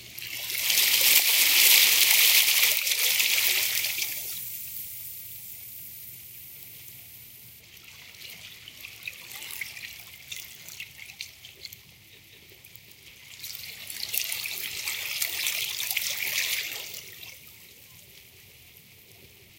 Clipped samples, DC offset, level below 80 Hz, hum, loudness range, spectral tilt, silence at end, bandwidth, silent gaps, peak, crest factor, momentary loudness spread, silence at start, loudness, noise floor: under 0.1%; under 0.1%; -68 dBFS; none; 23 LU; 2.5 dB/octave; 1.6 s; 17 kHz; none; -2 dBFS; 26 dB; 25 LU; 0 s; -22 LUFS; -52 dBFS